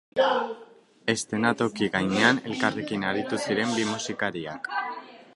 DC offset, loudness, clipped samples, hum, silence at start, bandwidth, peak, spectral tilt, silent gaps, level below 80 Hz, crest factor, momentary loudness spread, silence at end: under 0.1%; -26 LUFS; under 0.1%; none; 0.15 s; 11.5 kHz; -4 dBFS; -4 dB/octave; none; -64 dBFS; 24 dB; 11 LU; 0.1 s